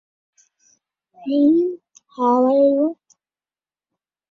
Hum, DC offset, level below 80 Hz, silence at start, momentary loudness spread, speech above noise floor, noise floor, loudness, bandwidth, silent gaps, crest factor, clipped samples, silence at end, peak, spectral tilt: none; under 0.1%; -70 dBFS; 1.2 s; 19 LU; over 74 dB; under -90 dBFS; -18 LUFS; 7 kHz; none; 14 dB; under 0.1%; 1.4 s; -6 dBFS; -7 dB/octave